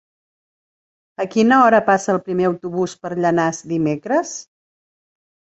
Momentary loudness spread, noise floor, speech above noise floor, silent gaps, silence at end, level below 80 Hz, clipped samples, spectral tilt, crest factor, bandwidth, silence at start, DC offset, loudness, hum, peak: 11 LU; under -90 dBFS; over 73 dB; none; 1.15 s; -62 dBFS; under 0.1%; -5.5 dB/octave; 18 dB; 8.2 kHz; 1.2 s; under 0.1%; -18 LUFS; none; -2 dBFS